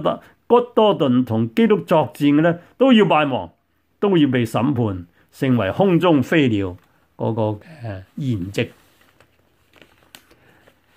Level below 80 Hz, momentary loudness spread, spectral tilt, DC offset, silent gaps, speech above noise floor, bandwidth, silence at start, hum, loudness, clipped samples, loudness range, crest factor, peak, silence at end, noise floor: -58 dBFS; 13 LU; -7.5 dB/octave; under 0.1%; none; 42 dB; 15.5 kHz; 0 s; none; -18 LUFS; under 0.1%; 11 LU; 16 dB; -2 dBFS; 2.3 s; -60 dBFS